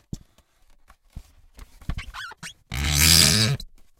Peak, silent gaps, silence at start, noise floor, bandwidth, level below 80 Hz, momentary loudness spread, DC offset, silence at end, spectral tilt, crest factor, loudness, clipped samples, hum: -2 dBFS; none; 0.15 s; -57 dBFS; 16.5 kHz; -36 dBFS; 26 LU; under 0.1%; 0.3 s; -2 dB/octave; 22 dB; -17 LUFS; under 0.1%; none